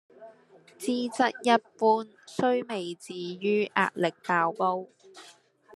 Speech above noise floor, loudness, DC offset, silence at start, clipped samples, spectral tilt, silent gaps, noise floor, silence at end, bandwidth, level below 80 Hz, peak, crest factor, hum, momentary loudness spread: 29 dB; -28 LUFS; under 0.1%; 0.2 s; under 0.1%; -5 dB/octave; none; -57 dBFS; 0.45 s; 13 kHz; -82 dBFS; -6 dBFS; 22 dB; none; 12 LU